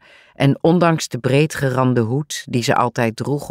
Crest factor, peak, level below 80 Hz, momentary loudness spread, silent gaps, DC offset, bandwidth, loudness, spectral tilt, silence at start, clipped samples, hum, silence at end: 14 dB; -2 dBFS; -54 dBFS; 6 LU; none; under 0.1%; 16 kHz; -18 LUFS; -6 dB/octave; 0.4 s; under 0.1%; none; 0 s